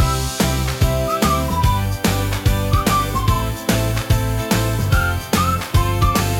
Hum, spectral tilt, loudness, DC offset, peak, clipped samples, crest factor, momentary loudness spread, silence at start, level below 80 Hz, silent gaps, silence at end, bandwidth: none; -5 dB/octave; -18 LUFS; under 0.1%; -4 dBFS; under 0.1%; 14 dB; 2 LU; 0 s; -24 dBFS; none; 0 s; 18 kHz